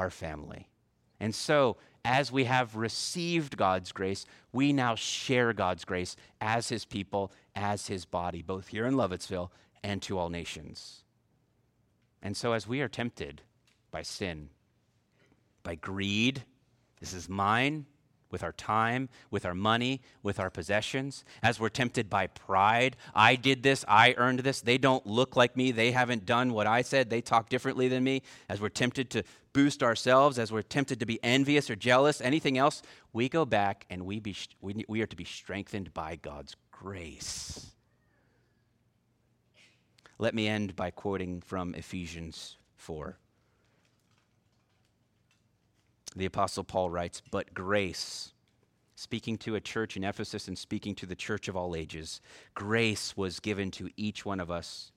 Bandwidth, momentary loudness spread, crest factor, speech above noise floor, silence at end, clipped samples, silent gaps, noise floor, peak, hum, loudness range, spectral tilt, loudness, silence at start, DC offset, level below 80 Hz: 15.5 kHz; 16 LU; 26 dB; 41 dB; 0.1 s; under 0.1%; none; -72 dBFS; -6 dBFS; none; 14 LU; -4.5 dB/octave; -30 LUFS; 0 s; under 0.1%; -62 dBFS